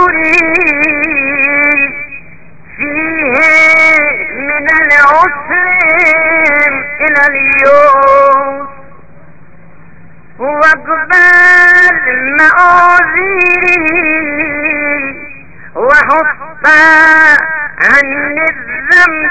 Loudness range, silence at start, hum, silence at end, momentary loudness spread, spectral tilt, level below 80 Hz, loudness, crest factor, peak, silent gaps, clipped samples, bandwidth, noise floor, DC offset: 5 LU; 0 s; none; 0 s; 11 LU; -4 dB/octave; -42 dBFS; -6 LUFS; 8 dB; 0 dBFS; none; 2%; 8 kHz; -39 dBFS; 3%